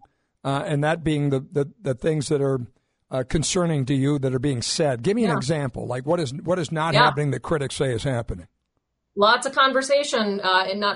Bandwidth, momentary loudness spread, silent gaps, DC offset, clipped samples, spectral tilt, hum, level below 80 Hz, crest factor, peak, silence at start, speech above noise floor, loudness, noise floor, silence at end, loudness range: 11 kHz; 10 LU; none; under 0.1%; under 0.1%; -5 dB/octave; none; -46 dBFS; 18 dB; -4 dBFS; 0.45 s; 53 dB; -22 LUFS; -75 dBFS; 0 s; 3 LU